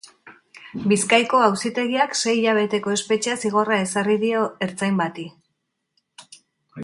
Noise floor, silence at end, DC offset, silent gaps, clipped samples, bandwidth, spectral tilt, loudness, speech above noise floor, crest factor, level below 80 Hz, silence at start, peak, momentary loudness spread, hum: -76 dBFS; 0 s; under 0.1%; none; under 0.1%; 11.5 kHz; -4 dB/octave; -21 LUFS; 55 dB; 20 dB; -66 dBFS; 0.25 s; -2 dBFS; 9 LU; none